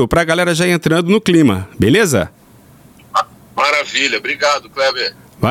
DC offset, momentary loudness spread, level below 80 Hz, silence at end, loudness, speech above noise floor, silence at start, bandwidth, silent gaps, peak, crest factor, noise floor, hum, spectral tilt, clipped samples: under 0.1%; 8 LU; -40 dBFS; 0 s; -14 LUFS; 30 dB; 0 s; 16.5 kHz; none; -2 dBFS; 14 dB; -44 dBFS; none; -4.5 dB/octave; under 0.1%